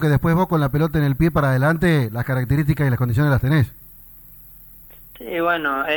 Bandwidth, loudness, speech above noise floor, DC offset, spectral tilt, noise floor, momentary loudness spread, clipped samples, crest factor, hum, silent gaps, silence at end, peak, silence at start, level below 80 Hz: over 20 kHz; -19 LUFS; 25 dB; under 0.1%; -8 dB/octave; -43 dBFS; 5 LU; under 0.1%; 12 dB; none; none; 0 s; -6 dBFS; 0 s; -38 dBFS